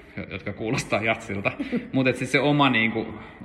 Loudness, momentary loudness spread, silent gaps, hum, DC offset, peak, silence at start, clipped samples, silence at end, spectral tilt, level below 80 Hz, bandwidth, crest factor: -24 LUFS; 14 LU; none; none; under 0.1%; -6 dBFS; 0 s; under 0.1%; 0 s; -5.5 dB/octave; -54 dBFS; 13 kHz; 18 dB